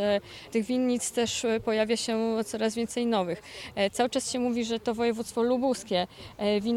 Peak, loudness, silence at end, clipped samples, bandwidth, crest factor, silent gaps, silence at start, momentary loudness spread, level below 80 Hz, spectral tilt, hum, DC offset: -14 dBFS; -28 LUFS; 0 s; under 0.1%; 15.5 kHz; 14 dB; none; 0 s; 5 LU; -60 dBFS; -4 dB/octave; none; under 0.1%